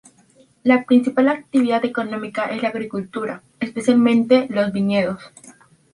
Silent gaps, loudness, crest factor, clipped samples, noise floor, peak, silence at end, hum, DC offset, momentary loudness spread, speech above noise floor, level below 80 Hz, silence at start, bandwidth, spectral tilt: none; -19 LUFS; 18 dB; under 0.1%; -54 dBFS; -2 dBFS; 0.4 s; none; under 0.1%; 12 LU; 36 dB; -62 dBFS; 0.65 s; 11 kHz; -6.5 dB/octave